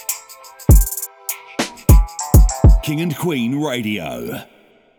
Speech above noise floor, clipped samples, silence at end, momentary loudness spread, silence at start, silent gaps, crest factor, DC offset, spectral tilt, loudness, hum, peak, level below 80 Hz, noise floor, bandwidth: 19 dB; under 0.1%; 0.55 s; 13 LU; 0.1 s; none; 16 dB; under 0.1%; -5.5 dB/octave; -17 LUFS; none; 0 dBFS; -18 dBFS; -40 dBFS; over 20 kHz